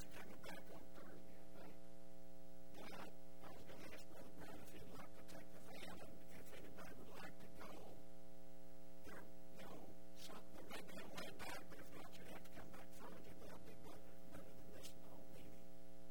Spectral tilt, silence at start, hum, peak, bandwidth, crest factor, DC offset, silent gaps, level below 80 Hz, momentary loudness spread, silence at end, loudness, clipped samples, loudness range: -4.5 dB/octave; 0 s; none; -36 dBFS; 16 kHz; 20 dB; 0.7%; none; -72 dBFS; 8 LU; 0 s; -59 LUFS; under 0.1%; 4 LU